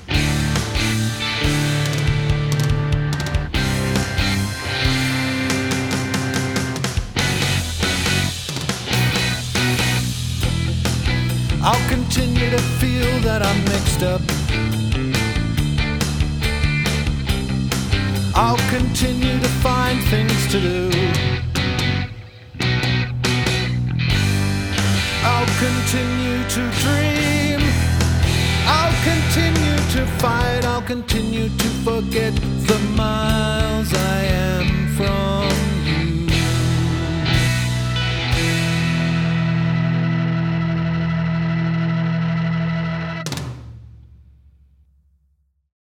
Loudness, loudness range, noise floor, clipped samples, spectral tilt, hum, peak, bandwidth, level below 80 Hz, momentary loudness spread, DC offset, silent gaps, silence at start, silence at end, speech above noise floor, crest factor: -19 LUFS; 3 LU; -63 dBFS; under 0.1%; -5 dB/octave; none; -2 dBFS; over 20 kHz; -28 dBFS; 4 LU; under 0.1%; none; 0 s; 1.95 s; 45 dB; 18 dB